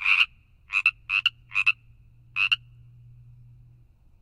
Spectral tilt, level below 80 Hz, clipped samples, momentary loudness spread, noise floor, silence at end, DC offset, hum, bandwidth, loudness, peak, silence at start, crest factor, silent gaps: 0.5 dB/octave; -58 dBFS; under 0.1%; 6 LU; -56 dBFS; 1.65 s; under 0.1%; none; 12.5 kHz; -24 LUFS; -6 dBFS; 0 s; 22 dB; none